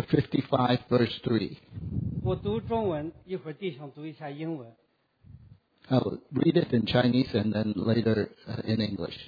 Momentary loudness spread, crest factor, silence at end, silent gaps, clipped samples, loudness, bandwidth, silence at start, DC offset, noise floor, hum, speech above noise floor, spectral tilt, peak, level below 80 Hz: 12 LU; 20 dB; 0 s; none; under 0.1%; -28 LUFS; 5 kHz; 0 s; under 0.1%; -57 dBFS; none; 29 dB; -9 dB/octave; -10 dBFS; -54 dBFS